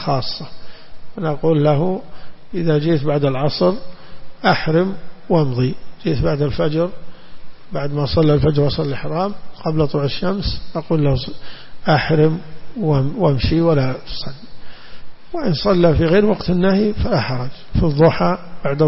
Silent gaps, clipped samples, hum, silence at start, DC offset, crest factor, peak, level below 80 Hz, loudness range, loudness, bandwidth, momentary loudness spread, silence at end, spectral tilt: none; under 0.1%; none; 0 s; under 0.1%; 14 dB; -2 dBFS; -34 dBFS; 3 LU; -18 LUFS; 5.8 kHz; 13 LU; 0 s; -11 dB/octave